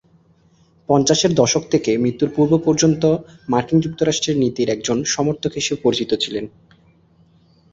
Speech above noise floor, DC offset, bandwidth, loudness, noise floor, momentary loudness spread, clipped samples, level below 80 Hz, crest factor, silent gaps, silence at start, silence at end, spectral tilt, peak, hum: 37 dB; under 0.1%; 7.8 kHz; -18 LUFS; -55 dBFS; 6 LU; under 0.1%; -52 dBFS; 18 dB; none; 0.9 s; 1.25 s; -4.5 dB/octave; -2 dBFS; none